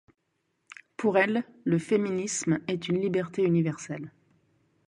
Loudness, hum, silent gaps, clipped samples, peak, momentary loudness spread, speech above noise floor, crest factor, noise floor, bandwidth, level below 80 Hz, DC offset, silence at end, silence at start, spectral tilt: -28 LUFS; none; none; under 0.1%; -10 dBFS; 13 LU; 50 dB; 20 dB; -77 dBFS; 11 kHz; -66 dBFS; under 0.1%; 0.8 s; 0.7 s; -5.5 dB/octave